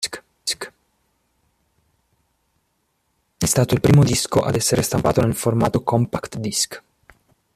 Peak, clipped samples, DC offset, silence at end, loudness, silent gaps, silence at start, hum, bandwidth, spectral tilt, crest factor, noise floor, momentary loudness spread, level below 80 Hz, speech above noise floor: -2 dBFS; under 0.1%; under 0.1%; 0.75 s; -19 LUFS; none; 0 s; none; 14.5 kHz; -5 dB/octave; 20 dB; -69 dBFS; 12 LU; -46 dBFS; 51 dB